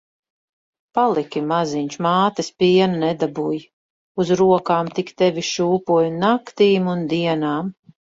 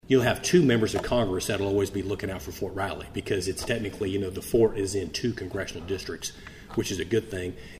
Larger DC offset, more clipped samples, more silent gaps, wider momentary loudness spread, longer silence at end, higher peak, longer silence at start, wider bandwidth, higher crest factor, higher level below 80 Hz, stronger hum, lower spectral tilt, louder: neither; neither; first, 3.73-4.15 s vs none; second, 9 LU vs 12 LU; first, 0.4 s vs 0 s; first, -4 dBFS vs -8 dBFS; first, 0.95 s vs 0.05 s; second, 7.8 kHz vs 15.5 kHz; about the same, 16 dB vs 18 dB; second, -62 dBFS vs -46 dBFS; neither; about the same, -6 dB/octave vs -5 dB/octave; first, -19 LUFS vs -28 LUFS